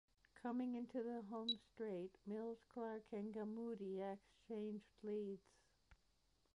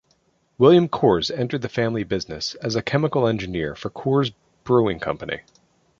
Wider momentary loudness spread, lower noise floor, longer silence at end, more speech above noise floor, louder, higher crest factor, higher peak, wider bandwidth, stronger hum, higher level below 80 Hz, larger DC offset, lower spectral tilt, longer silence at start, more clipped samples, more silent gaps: second, 7 LU vs 12 LU; first, -81 dBFS vs -64 dBFS; about the same, 0.6 s vs 0.6 s; second, 33 dB vs 44 dB; second, -49 LUFS vs -22 LUFS; about the same, 16 dB vs 20 dB; second, -32 dBFS vs -2 dBFS; first, 11 kHz vs 7.6 kHz; neither; second, -82 dBFS vs -50 dBFS; neither; about the same, -6.5 dB/octave vs -6.5 dB/octave; second, 0.35 s vs 0.6 s; neither; neither